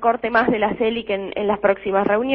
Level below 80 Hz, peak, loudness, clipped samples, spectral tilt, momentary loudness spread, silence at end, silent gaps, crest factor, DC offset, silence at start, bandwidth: -50 dBFS; -4 dBFS; -20 LUFS; under 0.1%; -9 dB/octave; 5 LU; 0 s; none; 16 dB; under 0.1%; 0 s; 5.8 kHz